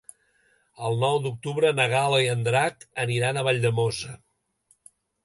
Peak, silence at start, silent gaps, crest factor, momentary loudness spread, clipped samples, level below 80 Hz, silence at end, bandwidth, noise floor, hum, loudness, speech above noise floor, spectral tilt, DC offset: -6 dBFS; 0.8 s; none; 20 dB; 9 LU; under 0.1%; -62 dBFS; 1.1 s; 11.5 kHz; -66 dBFS; none; -24 LUFS; 42 dB; -4.5 dB/octave; under 0.1%